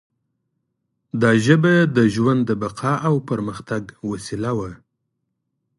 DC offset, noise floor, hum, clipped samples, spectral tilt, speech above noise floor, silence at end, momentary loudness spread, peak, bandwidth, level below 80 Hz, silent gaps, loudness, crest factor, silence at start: under 0.1%; -75 dBFS; none; under 0.1%; -7 dB/octave; 57 dB; 1.05 s; 14 LU; -2 dBFS; 11.5 kHz; -54 dBFS; none; -19 LUFS; 20 dB; 1.15 s